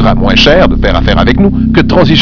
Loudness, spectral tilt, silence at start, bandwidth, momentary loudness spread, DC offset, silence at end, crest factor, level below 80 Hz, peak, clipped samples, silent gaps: -7 LUFS; -6.5 dB/octave; 0 s; 5.4 kHz; 4 LU; under 0.1%; 0 s; 6 dB; -14 dBFS; 0 dBFS; 3%; none